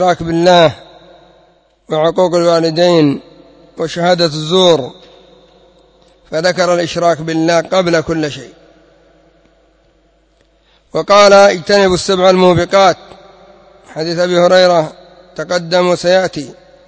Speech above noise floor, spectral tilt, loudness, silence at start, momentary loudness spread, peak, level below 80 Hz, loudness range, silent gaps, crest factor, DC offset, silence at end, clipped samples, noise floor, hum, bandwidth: 42 dB; -5 dB/octave; -11 LUFS; 0 s; 15 LU; 0 dBFS; -46 dBFS; 6 LU; none; 12 dB; under 0.1%; 0.35 s; 0.3%; -53 dBFS; none; 8 kHz